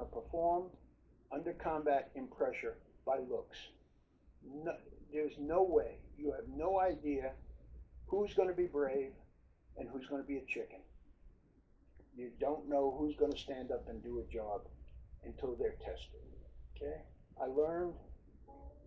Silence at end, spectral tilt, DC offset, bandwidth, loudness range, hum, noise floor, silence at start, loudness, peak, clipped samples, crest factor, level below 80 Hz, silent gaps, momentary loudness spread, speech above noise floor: 0 s; -5 dB/octave; under 0.1%; 7.6 kHz; 7 LU; none; -69 dBFS; 0 s; -39 LUFS; -20 dBFS; under 0.1%; 20 dB; -58 dBFS; none; 22 LU; 30 dB